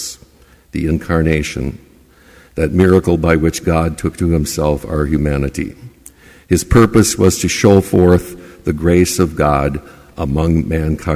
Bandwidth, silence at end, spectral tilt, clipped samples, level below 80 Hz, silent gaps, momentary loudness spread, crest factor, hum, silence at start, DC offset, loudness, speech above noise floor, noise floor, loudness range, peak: 16 kHz; 0 s; -6 dB/octave; under 0.1%; -26 dBFS; none; 13 LU; 14 dB; none; 0 s; under 0.1%; -14 LUFS; 33 dB; -47 dBFS; 4 LU; 0 dBFS